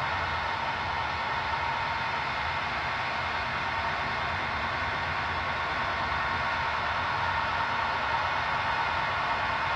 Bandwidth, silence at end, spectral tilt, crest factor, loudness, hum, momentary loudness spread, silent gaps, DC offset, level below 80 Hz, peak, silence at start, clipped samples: 10.5 kHz; 0 s; -4 dB/octave; 14 dB; -29 LUFS; none; 2 LU; none; under 0.1%; -50 dBFS; -16 dBFS; 0 s; under 0.1%